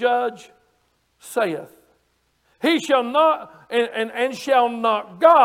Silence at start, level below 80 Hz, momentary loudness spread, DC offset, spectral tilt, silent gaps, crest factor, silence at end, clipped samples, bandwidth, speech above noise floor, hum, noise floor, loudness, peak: 0 s; -72 dBFS; 9 LU; under 0.1%; -3.5 dB/octave; none; 18 dB; 0 s; under 0.1%; 16 kHz; 47 dB; none; -66 dBFS; -20 LUFS; -2 dBFS